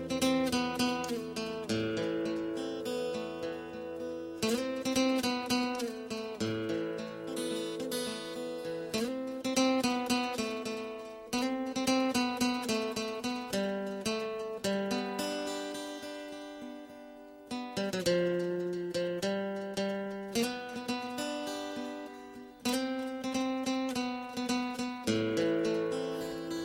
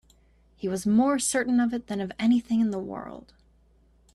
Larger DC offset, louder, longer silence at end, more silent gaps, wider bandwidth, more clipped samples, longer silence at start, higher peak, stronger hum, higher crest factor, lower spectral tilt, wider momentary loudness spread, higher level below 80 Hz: neither; second, -34 LUFS vs -26 LUFS; second, 0 s vs 0.95 s; neither; first, 16 kHz vs 12.5 kHz; neither; second, 0 s vs 0.6 s; about the same, -14 dBFS vs -12 dBFS; neither; first, 20 dB vs 14 dB; about the same, -4 dB/octave vs -4.5 dB/octave; second, 10 LU vs 14 LU; second, -66 dBFS vs -58 dBFS